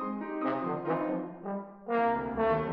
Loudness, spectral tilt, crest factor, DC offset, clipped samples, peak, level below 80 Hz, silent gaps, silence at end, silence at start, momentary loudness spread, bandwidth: -32 LUFS; -10 dB/octave; 14 dB; under 0.1%; under 0.1%; -16 dBFS; -58 dBFS; none; 0 s; 0 s; 9 LU; 5.4 kHz